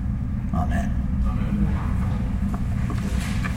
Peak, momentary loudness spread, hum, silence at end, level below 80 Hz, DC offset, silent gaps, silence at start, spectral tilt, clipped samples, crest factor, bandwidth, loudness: -12 dBFS; 2 LU; none; 0 s; -26 dBFS; under 0.1%; none; 0 s; -7.5 dB/octave; under 0.1%; 12 dB; 13.5 kHz; -25 LUFS